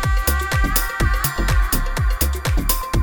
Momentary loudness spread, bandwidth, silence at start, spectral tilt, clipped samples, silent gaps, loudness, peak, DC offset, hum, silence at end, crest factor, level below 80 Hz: 2 LU; over 20 kHz; 0 s; -4 dB/octave; under 0.1%; none; -20 LUFS; 0 dBFS; under 0.1%; none; 0 s; 18 dB; -20 dBFS